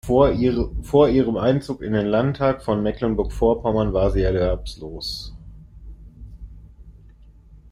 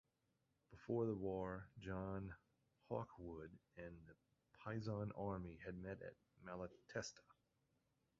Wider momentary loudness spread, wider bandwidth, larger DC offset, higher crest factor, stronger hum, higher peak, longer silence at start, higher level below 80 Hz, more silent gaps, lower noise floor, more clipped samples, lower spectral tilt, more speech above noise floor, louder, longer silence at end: second, 13 LU vs 17 LU; first, 15 kHz vs 7.2 kHz; neither; about the same, 18 dB vs 20 dB; neither; first, -2 dBFS vs -30 dBFS; second, 0.05 s vs 0.7 s; first, -34 dBFS vs -70 dBFS; neither; second, -47 dBFS vs -86 dBFS; neither; about the same, -7.5 dB/octave vs -6.5 dB/octave; second, 27 dB vs 37 dB; first, -21 LUFS vs -50 LUFS; second, 0.15 s vs 0.85 s